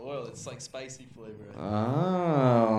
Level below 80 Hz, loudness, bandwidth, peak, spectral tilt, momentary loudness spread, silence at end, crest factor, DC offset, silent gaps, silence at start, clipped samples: -66 dBFS; -28 LUFS; 11.5 kHz; -10 dBFS; -7 dB/octave; 21 LU; 0 s; 18 dB; under 0.1%; none; 0 s; under 0.1%